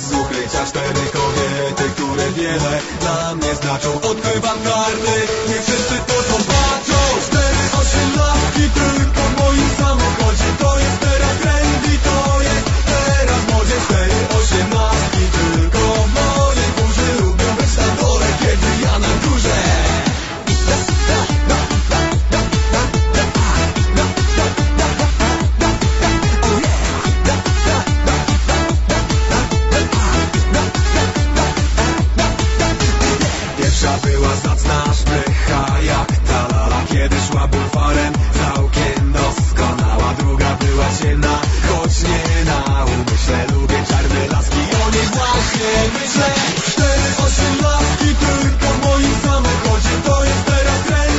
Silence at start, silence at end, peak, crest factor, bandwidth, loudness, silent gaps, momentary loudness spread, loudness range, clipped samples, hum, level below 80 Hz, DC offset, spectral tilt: 0 s; 0 s; 0 dBFS; 14 dB; 8 kHz; -15 LUFS; none; 3 LU; 1 LU; under 0.1%; none; -20 dBFS; under 0.1%; -4.5 dB/octave